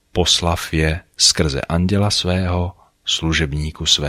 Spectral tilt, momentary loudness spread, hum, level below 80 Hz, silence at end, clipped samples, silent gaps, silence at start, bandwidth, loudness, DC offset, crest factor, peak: -3.5 dB/octave; 8 LU; none; -30 dBFS; 0 s; under 0.1%; none; 0.15 s; 15.5 kHz; -17 LUFS; under 0.1%; 18 dB; 0 dBFS